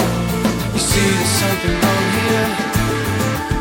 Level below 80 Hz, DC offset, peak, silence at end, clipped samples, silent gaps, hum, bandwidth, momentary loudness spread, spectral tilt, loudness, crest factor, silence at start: -30 dBFS; under 0.1%; -4 dBFS; 0 s; under 0.1%; none; none; 17 kHz; 4 LU; -4.5 dB/octave; -17 LUFS; 14 dB; 0 s